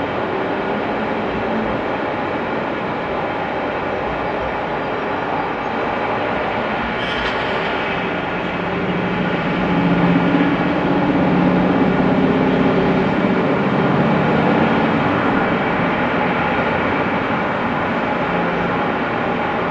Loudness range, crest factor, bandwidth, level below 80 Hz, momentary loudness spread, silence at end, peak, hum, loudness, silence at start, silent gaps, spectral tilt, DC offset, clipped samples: 5 LU; 16 dB; 7.6 kHz; -42 dBFS; 6 LU; 0 s; -2 dBFS; none; -18 LUFS; 0 s; none; -8 dB/octave; under 0.1%; under 0.1%